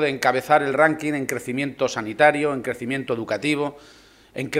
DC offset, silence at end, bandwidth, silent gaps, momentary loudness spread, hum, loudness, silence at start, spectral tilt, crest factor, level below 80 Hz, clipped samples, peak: under 0.1%; 0 s; 16 kHz; none; 10 LU; none; -22 LUFS; 0 s; -5 dB/octave; 20 dB; -60 dBFS; under 0.1%; -2 dBFS